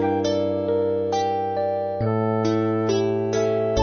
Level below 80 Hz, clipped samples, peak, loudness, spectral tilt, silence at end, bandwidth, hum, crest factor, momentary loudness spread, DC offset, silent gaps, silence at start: -48 dBFS; under 0.1%; -8 dBFS; -23 LUFS; -6.5 dB/octave; 0 s; 6.8 kHz; none; 12 dB; 2 LU; under 0.1%; none; 0 s